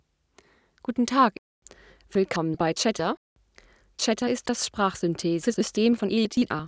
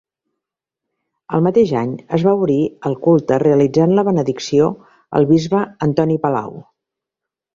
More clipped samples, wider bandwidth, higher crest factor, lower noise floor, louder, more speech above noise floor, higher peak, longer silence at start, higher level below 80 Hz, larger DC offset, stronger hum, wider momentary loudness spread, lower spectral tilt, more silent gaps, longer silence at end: neither; about the same, 8 kHz vs 7.6 kHz; about the same, 18 dB vs 16 dB; second, -61 dBFS vs -84 dBFS; second, -25 LUFS vs -16 LUFS; second, 37 dB vs 69 dB; second, -8 dBFS vs -2 dBFS; second, 0.9 s vs 1.3 s; about the same, -58 dBFS vs -54 dBFS; neither; neither; about the same, 8 LU vs 7 LU; second, -4.5 dB/octave vs -8 dB/octave; first, 1.39-1.62 s, 3.17-3.36 s vs none; second, 0 s vs 0.95 s